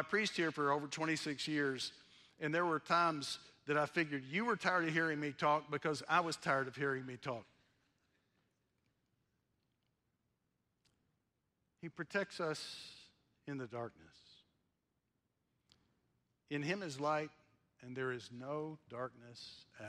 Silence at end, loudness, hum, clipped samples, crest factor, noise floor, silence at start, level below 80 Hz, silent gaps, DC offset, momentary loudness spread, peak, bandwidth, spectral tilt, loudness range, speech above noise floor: 0 s; -38 LUFS; none; under 0.1%; 22 dB; -85 dBFS; 0 s; -82 dBFS; none; under 0.1%; 14 LU; -20 dBFS; 13.5 kHz; -4.5 dB/octave; 15 LU; 46 dB